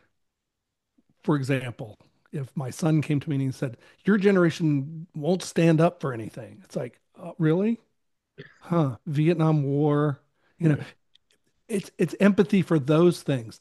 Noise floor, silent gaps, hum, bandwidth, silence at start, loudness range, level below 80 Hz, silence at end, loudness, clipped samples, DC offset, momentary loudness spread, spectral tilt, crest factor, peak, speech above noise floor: -83 dBFS; none; none; 12.5 kHz; 1.25 s; 4 LU; -68 dBFS; 0.05 s; -25 LUFS; under 0.1%; under 0.1%; 16 LU; -7.5 dB/octave; 18 dB; -6 dBFS; 59 dB